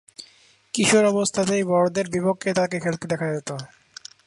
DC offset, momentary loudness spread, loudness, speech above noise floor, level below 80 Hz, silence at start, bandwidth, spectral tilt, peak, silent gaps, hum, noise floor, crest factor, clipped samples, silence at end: under 0.1%; 23 LU; -22 LUFS; 34 dB; -62 dBFS; 0.2 s; 11.5 kHz; -4.5 dB/octave; -6 dBFS; none; none; -56 dBFS; 18 dB; under 0.1%; 0.6 s